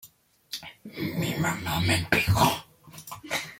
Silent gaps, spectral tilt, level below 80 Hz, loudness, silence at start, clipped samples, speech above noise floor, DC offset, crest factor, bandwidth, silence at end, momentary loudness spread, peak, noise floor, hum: none; -4.5 dB/octave; -50 dBFS; -26 LUFS; 0.05 s; under 0.1%; 31 dB; under 0.1%; 22 dB; 17 kHz; 0.05 s; 19 LU; -6 dBFS; -56 dBFS; none